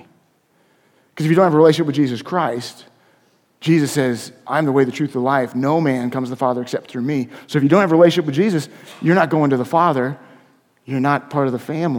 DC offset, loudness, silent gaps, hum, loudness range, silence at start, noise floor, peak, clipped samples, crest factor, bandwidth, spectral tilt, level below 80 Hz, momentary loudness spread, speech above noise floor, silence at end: under 0.1%; -18 LUFS; none; none; 4 LU; 1.15 s; -60 dBFS; 0 dBFS; under 0.1%; 18 dB; 17 kHz; -6.5 dB/octave; -66 dBFS; 11 LU; 43 dB; 0 s